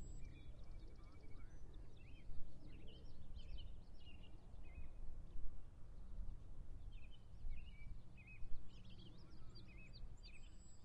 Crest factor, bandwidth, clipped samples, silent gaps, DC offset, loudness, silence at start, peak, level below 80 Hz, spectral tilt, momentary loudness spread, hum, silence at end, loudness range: 18 dB; 8.2 kHz; under 0.1%; none; under 0.1%; -61 LUFS; 0 s; -28 dBFS; -54 dBFS; -5.5 dB/octave; 5 LU; none; 0 s; 2 LU